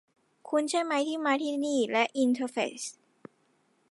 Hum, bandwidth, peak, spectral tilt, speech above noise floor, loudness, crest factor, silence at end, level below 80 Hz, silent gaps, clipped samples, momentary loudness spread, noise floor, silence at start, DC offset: none; 11.5 kHz; -12 dBFS; -2.5 dB/octave; 41 dB; -29 LUFS; 18 dB; 1 s; -84 dBFS; none; under 0.1%; 6 LU; -70 dBFS; 0.45 s; under 0.1%